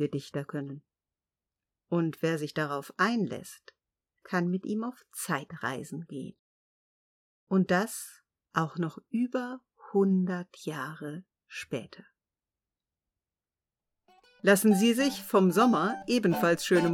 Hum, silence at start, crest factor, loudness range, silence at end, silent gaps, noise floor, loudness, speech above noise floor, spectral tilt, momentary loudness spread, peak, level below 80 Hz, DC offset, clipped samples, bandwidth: none; 0 s; 20 dB; 11 LU; 0 s; 6.39-7.47 s; under -90 dBFS; -29 LUFS; over 61 dB; -5.5 dB/octave; 18 LU; -10 dBFS; -74 dBFS; under 0.1%; under 0.1%; 18.5 kHz